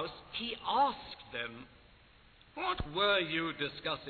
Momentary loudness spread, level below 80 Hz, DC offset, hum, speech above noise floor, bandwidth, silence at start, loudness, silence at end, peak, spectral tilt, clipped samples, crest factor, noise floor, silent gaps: 14 LU; -56 dBFS; under 0.1%; none; 27 dB; 4.6 kHz; 0 s; -34 LUFS; 0 s; -18 dBFS; -6.5 dB/octave; under 0.1%; 18 dB; -61 dBFS; none